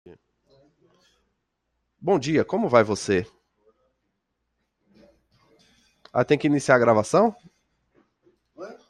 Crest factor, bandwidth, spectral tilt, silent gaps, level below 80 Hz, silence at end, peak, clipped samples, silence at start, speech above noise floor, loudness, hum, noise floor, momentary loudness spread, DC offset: 22 dB; 11.5 kHz; -6 dB/octave; none; -64 dBFS; 0.15 s; -2 dBFS; under 0.1%; 2 s; 56 dB; -22 LUFS; none; -77 dBFS; 13 LU; under 0.1%